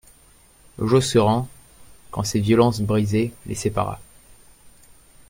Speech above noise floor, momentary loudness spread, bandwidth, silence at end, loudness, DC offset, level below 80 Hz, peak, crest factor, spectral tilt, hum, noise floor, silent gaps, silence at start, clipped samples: 33 dB; 12 LU; 16.5 kHz; 0.6 s; -21 LUFS; under 0.1%; -48 dBFS; -2 dBFS; 20 dB; -6 dB/octave; none; -53 dBFS; none; 0.8 s; under 0.1%